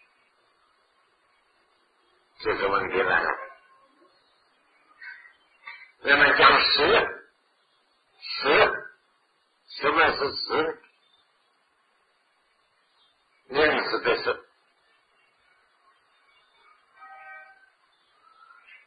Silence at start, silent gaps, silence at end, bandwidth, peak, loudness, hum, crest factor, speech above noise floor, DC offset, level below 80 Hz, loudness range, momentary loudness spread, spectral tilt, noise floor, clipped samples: 2.4 s; none; 1.45 s; 5 kHz; -4 dBFS; -22 LUFS; none; 26 dB; 47 dB; under 0.1%; -58 dBFS; 10 LU; 26 LU; -6 dB/octave; -68 dBFS; under 0.1%